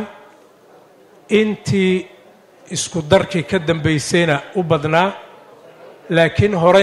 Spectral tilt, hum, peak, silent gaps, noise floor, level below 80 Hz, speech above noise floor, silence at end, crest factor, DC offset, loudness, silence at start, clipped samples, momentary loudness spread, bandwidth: -5 dB/octave; none; 0 dBFS; none; -47 dBFS; -50 dBFS; 32 dB; 0 s; 18 dB; under 0.1%; -17 LUFS; 0 s; under 0.1%; 8 LU; 12.5 kHz